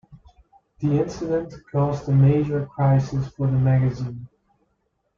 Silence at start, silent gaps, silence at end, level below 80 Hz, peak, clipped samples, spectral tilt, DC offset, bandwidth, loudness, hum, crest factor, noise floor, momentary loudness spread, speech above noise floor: 0.1 s; none; 0.9 s; -48 dBFS; -8 dBFS; under 0.1%; -9.5 dB/octave; under 0.1%; 7 kHz; -22 LUFS; none; 14 dB; -71 dBFS; 10 LU; 51 dB